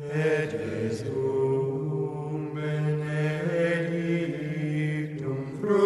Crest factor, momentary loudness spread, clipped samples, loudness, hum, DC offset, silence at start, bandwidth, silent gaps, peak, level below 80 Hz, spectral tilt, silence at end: 16 dB; 6 LU; under 0.1%; -28 LUFS; none; under 0.1%; 0 s; 11.5 kHz; none; -12 dBFS; -64 dBFS; -8 dB/octave; 0 s